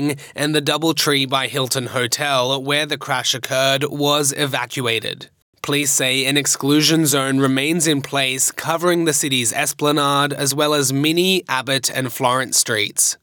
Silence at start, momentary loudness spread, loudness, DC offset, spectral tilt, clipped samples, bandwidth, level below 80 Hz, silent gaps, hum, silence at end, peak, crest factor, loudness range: 0 s; 5 LU; -17 LUFS; under 0.1%; -3 dB/octave; under 0.1%; over 20 kHz; -70 dBFS; 5.42-5.53 s; none; 0.1 s; -2 dBFS; 16 dB; 2 LU